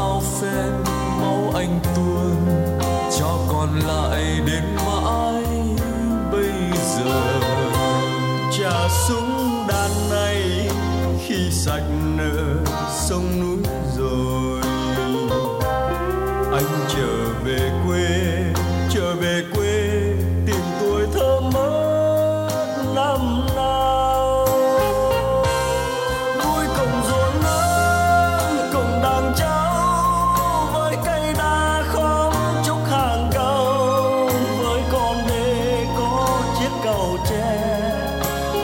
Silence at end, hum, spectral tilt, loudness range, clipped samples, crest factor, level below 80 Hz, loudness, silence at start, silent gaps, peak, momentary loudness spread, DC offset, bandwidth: 0 s; none; -5 dB/octave; 3 LU; under 0.1%; 14 dB; -30 dBFS; -20 LUFS; 0 s; none; -6 dBFS; 4 LU; under 0.1%; 16.5 kHz